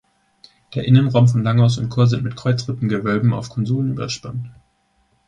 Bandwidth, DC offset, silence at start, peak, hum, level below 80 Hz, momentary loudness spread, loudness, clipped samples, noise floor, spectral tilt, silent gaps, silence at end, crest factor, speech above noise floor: 9 kHz; under 0.1%; 0.7 s; -2 dBFS; none; -50 dBFS; 12 LU; -18 LUFS; under 0.1%; -63 dBFS; -7 dB/octave; none; 0.75 s; 18 dB; 45 dB